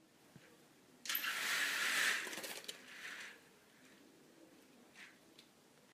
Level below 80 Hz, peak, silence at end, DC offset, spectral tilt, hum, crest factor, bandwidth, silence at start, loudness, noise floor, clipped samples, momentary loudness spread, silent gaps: under -90 dBFS; -22 dBFS; 0.5 s; under 0.1%; 1 dB/octave; none; 22 dB; 15.5 kHz; 0.35 s; -39 LUFS; -67 dBFS; under 0.1%; 24 LU; none